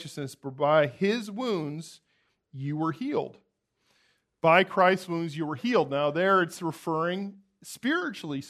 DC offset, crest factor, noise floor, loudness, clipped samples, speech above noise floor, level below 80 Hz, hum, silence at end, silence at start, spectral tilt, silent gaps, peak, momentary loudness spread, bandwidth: under 0.1%; 22 dB; -72 dBFS; -27 LUFS; under 0.1%; 45 dB; -76 dBFS; none; 0 s; 0 s; -5.5 dB/octave; none; -6 dBFS; 16 LU; 13.5 kHz